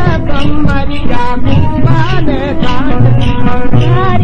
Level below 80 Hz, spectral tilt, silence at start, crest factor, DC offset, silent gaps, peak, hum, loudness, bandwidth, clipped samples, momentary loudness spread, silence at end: -18 dBFS; -8 dB/octave; 0 s; 6 dB; under 0.1%; none; 0 dBFS; none; -12 LUFS; 6.4 kHz; 0.2%; 5 LU; 0 s